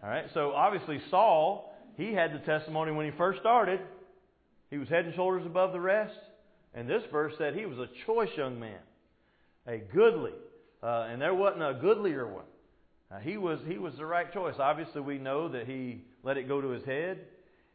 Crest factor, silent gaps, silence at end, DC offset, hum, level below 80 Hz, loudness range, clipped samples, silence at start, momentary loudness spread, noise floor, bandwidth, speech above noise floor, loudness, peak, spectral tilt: 18 dB; none; 0.45 s; under 0.1%; none; -72 dBFS; 6 LU; under 0.1%; 0 s; 16 LU; -68 dBFS; 4.8 kHz; 38 dB; -31 LUFS; -12 dBFS; -4 dB/octave